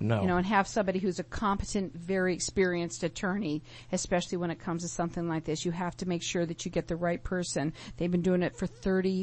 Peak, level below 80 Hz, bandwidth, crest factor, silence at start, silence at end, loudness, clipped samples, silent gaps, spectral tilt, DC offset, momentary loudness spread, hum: -12 dBFS; -50 dBFS; 8.4 kHz; 18 dB; 0 s; 0 s; -31 LUFS; under 0.1%; none; -5 dB/octave; under 0.1%; 7 LU; none